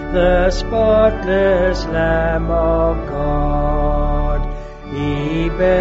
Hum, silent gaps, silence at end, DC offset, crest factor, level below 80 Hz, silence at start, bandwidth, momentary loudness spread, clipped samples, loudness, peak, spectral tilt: none; none; 0 s; under 0.1%; 14 dB; -22 dBFS; 0 s; 7.8 kHz; 8 LU; under 0.1%; -17 LUFS; -2 dBFS; -5.5 dB/octave